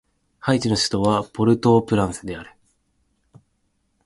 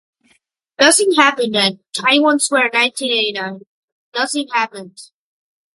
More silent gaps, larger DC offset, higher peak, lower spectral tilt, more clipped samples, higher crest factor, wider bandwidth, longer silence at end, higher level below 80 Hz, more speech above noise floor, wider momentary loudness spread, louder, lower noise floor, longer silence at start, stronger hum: second, none vs 3.67-4.12 s; neither; second, -4 dBFS vs 0 dBFS; first, -5.5 dB/octave vs -1.5 dB/octave; neither; about the same, 18 dB vs 18 dB; about the same, 11.5 kHz vs 12 kHz; first, 1.6 s vs 0.7 s; first, -48 dBFS vs -70 dBFS; first, 49 dB vs 45 dB; about the same, 14 LU vs 13 LU; second, -20 LUFS vs -15 LUFS; first, -69 dBFS vs -61 dBFS; second, 0.45 s vs 0.8 s; neither